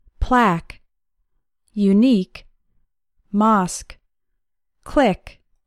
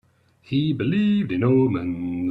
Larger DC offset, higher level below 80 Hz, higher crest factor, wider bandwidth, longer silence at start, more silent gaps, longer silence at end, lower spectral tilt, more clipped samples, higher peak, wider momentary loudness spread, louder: neither; first, -36 dBFS vs -56 dBFS; about the same, 16 dB vs 14 dB; first, 12.5 kHz vs 5 kHz; second, 0.2 s vs 0.5 s; neither; first, 0.4 s vs 0 s; second, -6 dB/octave vs -9.5 dB/octave; neither; first, -4 dBFS vs -8 dBFS; first, 15 LU vs 8 LU; first, -19 LUFS vs -22 LUFS